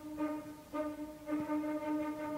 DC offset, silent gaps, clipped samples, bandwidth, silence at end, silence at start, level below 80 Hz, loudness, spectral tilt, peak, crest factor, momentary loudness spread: under 0.1%; none; under 0.1%; 16 kHz; 0 s; 0 s; -66 dBFS; -39 LUFS; -6 dB/octave; -26 dBFS; 12 dB; 7 LU